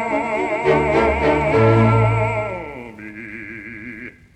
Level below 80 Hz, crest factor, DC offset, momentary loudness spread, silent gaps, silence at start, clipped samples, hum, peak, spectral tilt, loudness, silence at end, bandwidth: -36 dBFS; 16 dB; under 0.1%; 19 LU; none; 0 s; under 0.1%; none; -2 dBFS; -8 dB/octave; -17 LUFS; 0.25 s; 8.6 kHz